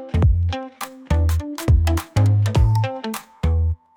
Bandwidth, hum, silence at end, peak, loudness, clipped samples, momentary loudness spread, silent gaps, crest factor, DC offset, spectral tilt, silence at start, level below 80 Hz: 18 kHz; none; 0.2 s; -6 dBFS; -20 LUFS; under 0.1%; 11 LU; none; 14 dB; under 0.1%; -7 dB/octave; 0 s; -26 dBFS